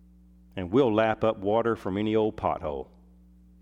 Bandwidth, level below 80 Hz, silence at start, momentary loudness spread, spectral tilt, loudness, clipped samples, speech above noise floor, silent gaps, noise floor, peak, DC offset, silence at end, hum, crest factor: 8 kHz; -54 dBFS; 0.55 s; 15 LU; -8 dB/octave; -26 LUFS; under 0.1%; 29 dB; none; -55 dBFS; -10 dBFS; under 0.1%; 0.8 s; none; 18 dB